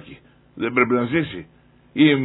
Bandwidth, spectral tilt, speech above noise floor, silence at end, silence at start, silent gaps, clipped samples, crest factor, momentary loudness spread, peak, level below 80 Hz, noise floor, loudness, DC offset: 4.1 kHz; -10 dB/octave; 27 dB; 0 s; 0.05 s; none; under 0.1%; 18 dB; 14 LU; -4 dBFS; -56 dBFS; -46 dBFS; -20 LUFS; under 0.1%